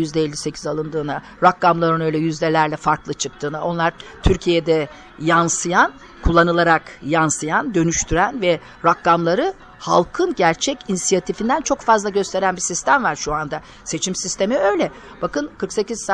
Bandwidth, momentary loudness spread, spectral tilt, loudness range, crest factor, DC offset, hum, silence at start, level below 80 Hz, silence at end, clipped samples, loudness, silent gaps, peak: 10.5 kHz; 9 LU; -4 dB/octave; 3 LU; 16 dB; under 0.1%; none; 0 s; -36 dBFS; 0 s; under 0.1%; -19 LUFS; none; -2 dBFS